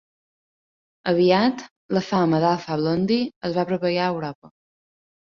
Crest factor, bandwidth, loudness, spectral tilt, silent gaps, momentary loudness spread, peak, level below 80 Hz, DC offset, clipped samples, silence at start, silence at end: 18 dB; 7.2 kHz; -22 LUFS; -7 dB/octave; 1.71-1.89 s, 3.36-3.41 s, 4.35-4.42 s; 10 LU; -6 dBFS; -60 dBFS; under 0.1%; under 0.1%; 1.05 s; 0.7 s